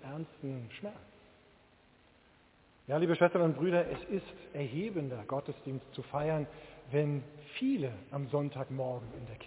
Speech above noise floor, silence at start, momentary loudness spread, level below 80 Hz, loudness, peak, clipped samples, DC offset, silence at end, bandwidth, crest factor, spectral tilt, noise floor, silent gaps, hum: 30 dB; 0 s; 16 LU; -64 dBFS; -35 LUFS; -12 dBFS; under 0.1%; under 0.1%; 0 s; 4 kHz; 22 dB; -6.5 dB/octave; -64 dBFS; none; none